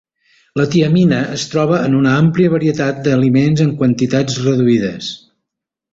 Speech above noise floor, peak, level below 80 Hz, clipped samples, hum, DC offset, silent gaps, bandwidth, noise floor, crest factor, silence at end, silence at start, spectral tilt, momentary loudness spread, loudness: 67 dB; -2 dBFS; -50 dBFS; under 0.1%; none; under 0.1%; none; 8 kHz; -80 dBFS; 14 dB; 0.75 s; 0.55 s; -6.5 dB/octave; 7 LU; -14 LUFS